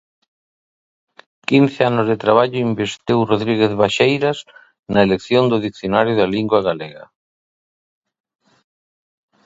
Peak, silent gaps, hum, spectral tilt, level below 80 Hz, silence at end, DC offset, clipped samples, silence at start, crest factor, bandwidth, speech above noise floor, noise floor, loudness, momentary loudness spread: 0 dBFS; 4.79-4.83 s; none; -6.5 dB/octave; -54 dBFS; 2.4 s; under 0.1%; under 0.1%; 1.5 s; 18 dB; 8 kHz; over 74 dB; under -90 dBFS; -17 LUFS; 7 LU